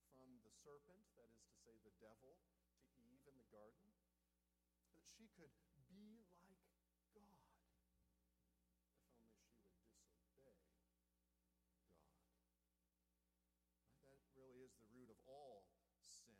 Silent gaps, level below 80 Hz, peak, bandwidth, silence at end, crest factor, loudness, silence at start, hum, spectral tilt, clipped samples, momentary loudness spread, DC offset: none; -88 dBFS; -54 dBFS; 12 kHz; 0 s; 20 dB; -68 LUFS; 0 s; 60 Hz at -90 dBFS; -4 dB/octave; under 0.1%; 5 LU; under 0.1%